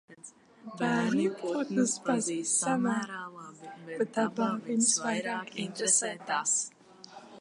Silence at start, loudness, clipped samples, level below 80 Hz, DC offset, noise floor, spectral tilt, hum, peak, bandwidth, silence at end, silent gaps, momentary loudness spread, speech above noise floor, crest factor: 0.1 s; -29 LUFS; under 0.1%; -84 dBFS; under 0.1%; -53 dBFS; -3 dB/octave; none; -14 dBFS; 11.5 kHz; 0 s; none; 21 LU; 23 dB; 18 dB